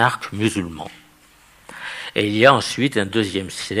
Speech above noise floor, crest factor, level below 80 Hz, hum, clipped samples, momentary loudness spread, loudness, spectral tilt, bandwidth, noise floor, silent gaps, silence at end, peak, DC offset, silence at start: 32 dB; 20 dB; -56 dBFS; none; under 0.1%; 20 LU; -19 LUFS; -4.5 dB/octave; 15.5 kHz; -52 dBFS; none; 0 s; 0 dBFS; under 0.1%; 0 s